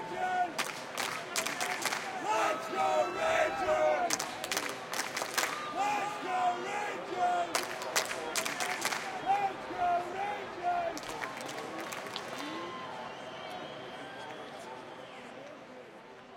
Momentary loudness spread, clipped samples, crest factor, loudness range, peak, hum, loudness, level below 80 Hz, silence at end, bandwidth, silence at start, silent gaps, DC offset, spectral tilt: 14 LU; under 0.1%; 26 dB; 10 LU; -10 dBFS; none; -34 LUFS; -70 dBFS; 0 s; 17 kHz; 0 s; none; under 0.1%; -1.5 dB/octave